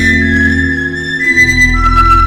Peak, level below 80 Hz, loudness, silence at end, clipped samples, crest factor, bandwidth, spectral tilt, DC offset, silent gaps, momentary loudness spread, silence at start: 0 dBFS; -18 dBFS; -9 LUFS; 0 s; 0.1%; 10 dB; 15 kHz; -4.5 dB/octave; under 0.1%; none; 7 LU; 0 s